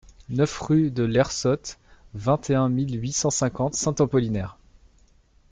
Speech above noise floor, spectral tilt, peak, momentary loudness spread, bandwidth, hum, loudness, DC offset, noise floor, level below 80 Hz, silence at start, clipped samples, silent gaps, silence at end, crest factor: 35 dB; -5.5 dB/octave; -8 dBFS; 9 LU; 9.6 kHz; none; -24 LUFS; under 0.1%; -58 dBFS; -48 dBFS; 0.3 s; under 0.1%; none; 1 s; 16 dB